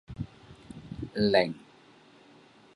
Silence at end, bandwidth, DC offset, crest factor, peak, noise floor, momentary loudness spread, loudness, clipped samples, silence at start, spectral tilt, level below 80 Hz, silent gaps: 1.15 s; 11.5 kHz; under 0.1%; 24 dB; -8 dBFS; -57 dBFS; 22 LU; -29 LUFS; under 0.1%; 0.1 s; -6.5 dB/octave; -56 dBFS; none